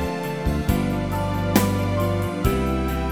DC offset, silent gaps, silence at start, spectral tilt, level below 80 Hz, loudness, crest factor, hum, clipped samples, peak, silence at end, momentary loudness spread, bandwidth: 0.3%; none; 0 s; -6.5 dB/octave; -30 dBFS; -23 LUFS; 20 dB; none; under 0.1%; -2 dBFS; 0 s; 5 LU; over 20 kHz